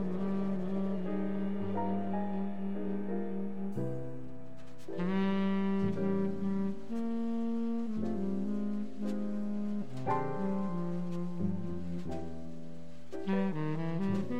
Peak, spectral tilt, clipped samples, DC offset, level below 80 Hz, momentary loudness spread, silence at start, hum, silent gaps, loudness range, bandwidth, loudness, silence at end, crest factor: -20 dBFS; -9 dB/octave; under 0.1%; 1%; -64 dBFS; 10 LU; 0 s; none; none; 4 LU; 7.8 kHz; -35 LUFS; 0 s; 14 dB